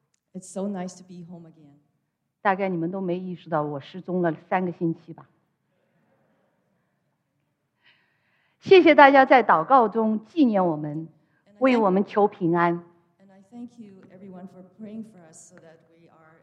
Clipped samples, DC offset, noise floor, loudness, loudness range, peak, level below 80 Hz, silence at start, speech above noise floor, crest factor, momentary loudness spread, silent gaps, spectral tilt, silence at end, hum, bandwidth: under 0.1%; under 0.1%; -76 dBFS; -21 LUFS; 13 LU; 0 dBFS; -78 dBFS; 0.35 s; 54 dB; 24 dB; 27 LU; none; -6.5 dB/octave; 1.4 s; none; 10 kHz